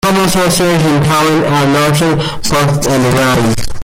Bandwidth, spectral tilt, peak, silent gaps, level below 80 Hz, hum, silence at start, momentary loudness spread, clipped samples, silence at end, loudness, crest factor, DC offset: 17 kHz; -5 dB/octave; -2 dBFS; none; -30 dBFS; none; 0.05 s; 3 LU; under 0.1%; 0 s; -11 LUFS; 8 dB; under 0.1%